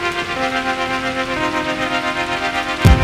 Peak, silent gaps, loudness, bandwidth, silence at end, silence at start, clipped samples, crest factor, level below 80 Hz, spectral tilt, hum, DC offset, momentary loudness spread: 0 dBFS; none; -19 LUFS; 16 kHz; 0 s; 0 s; under 0.1%; 18 dB; -26 dBFS; -5 dB/octave; none; under 0.1%; 4 LU